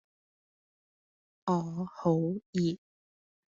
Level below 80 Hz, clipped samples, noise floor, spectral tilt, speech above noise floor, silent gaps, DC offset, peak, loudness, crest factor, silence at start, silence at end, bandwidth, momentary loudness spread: -72 dBFS; under 0.1%; under -90 dBFS; -8 dB/octave; over 60 dB; 2.46-2.53 s; under 0.1%; -14 dBFS; -32 LUFS; 20 dB; 1.45 s; 0.8 s; 7.6 kHz; 9 LU